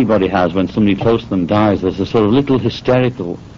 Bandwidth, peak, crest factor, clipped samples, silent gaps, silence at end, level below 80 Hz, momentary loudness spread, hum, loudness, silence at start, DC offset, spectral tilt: 7.2 kHz; -2 dBFS; 12 dB; under 0.1%; none; 0 s; -40 dBFS; 3 LU; none; -15 LUFS; 0 s; under 0.1%; -6 dB/octave